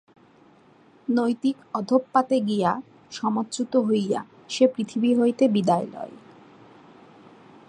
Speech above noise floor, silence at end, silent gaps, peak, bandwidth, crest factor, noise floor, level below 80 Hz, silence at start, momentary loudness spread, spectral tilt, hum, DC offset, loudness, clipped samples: 32 dB; 1.55 s; none; -6 dBFS; 10.5 kHz; 20 dB; -55 dBFS; -72 dBFS; 1.1 s; 12 LU; -6 dB/octave; none; under 0.1%; -24 LUFS; under 0.1%